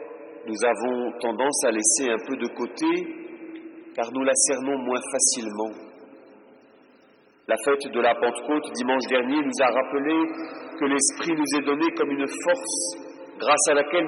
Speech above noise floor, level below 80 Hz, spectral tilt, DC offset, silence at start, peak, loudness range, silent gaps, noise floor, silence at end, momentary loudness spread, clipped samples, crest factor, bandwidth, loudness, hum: 33 dB; -80 dBFS; -1.5 dB/octave; under 0.1%; 0 s; -6 dBFS; 4 LU; none; -57 dBFS; 0 s; 16 LU; under 0.1%; 18 dB; 12.5 kHz; -23 LUFS; none